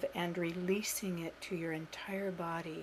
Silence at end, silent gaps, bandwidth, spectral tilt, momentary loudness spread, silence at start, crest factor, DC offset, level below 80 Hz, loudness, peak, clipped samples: 0 s; none; 15.5 kHz; -4.5 dB/octave; 7 LU; 0 s; 16 dB; under 0.1%; -68 dBFS; -38 LUFS; -22 dBFS; under 0.1%